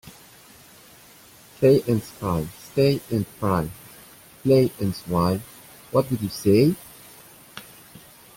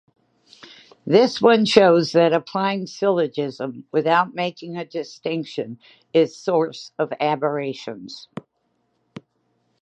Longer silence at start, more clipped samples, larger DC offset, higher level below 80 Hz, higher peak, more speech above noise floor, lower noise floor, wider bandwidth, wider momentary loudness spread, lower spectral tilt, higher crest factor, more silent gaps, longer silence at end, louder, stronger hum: second, 0.05 s vs 1.05 s; neither; neither; first, -52 dBFS vs -70 dBFS; second, -6 dBFS vs 0 dBFS; second, 28 dB vs 50 dB; second, -49 dBFS vs -70 dBFS; first, 17 kHz vs 9 kHz; first, 24 LU vs 19 LU; first, -7 dB/octave vs -5.5 dB/octave; about the same, 18 dB vs 22 dB; neither; second, 0.4 s vs 1.6 s; second, -23 LUFS vs -20 LUFS; neither